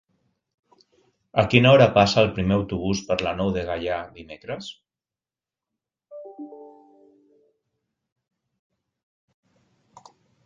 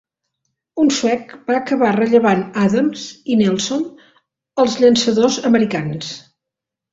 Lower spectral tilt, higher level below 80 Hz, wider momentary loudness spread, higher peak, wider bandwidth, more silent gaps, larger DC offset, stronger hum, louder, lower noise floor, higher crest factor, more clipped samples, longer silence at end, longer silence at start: about the same, -6 dB/octave vs -5 dB/octave; first, -48 dBFS vs -58 dBFS; first, 25 LU vs 14 LU; about the same, -2 dBFS vs -2 dBFS; about the same, 7.6 kHz vs 8 kHz; neither; neither; neither; second, -20 LUFS vs -16 LUFS; first, under -90 dBFS vs -84 dBFS; first, 24 dB vs 16 dB; neither; first, 3.8 s vs 0.75 s; first, 1.35 s vs 0.75 s